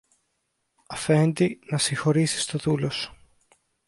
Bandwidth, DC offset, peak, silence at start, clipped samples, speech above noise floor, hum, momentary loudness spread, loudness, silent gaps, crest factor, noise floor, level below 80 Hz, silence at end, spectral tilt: 11.5 kHz; under 0.1%; -8 dBFS; 0.9 s; under 0.1%; 52 dB; none; 10 LU; -24 LUFS; none; 18 dB; -76 dBFS; -60 dBFS; 0.75 s; -5 dB/octave